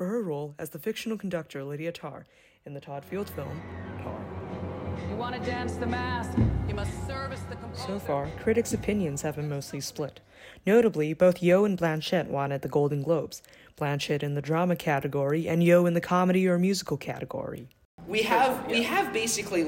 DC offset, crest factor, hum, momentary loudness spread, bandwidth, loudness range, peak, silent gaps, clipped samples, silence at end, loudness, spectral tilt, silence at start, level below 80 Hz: under 0.1%; 20 dB; none; 15 LU; 16.5 kHz; 11 LU; -8 dBFS; 17.85-17.98 s; under 0.1%; 0 s; -28 LUFS; -5.5 dB/octave; 0 s; -48 dBFS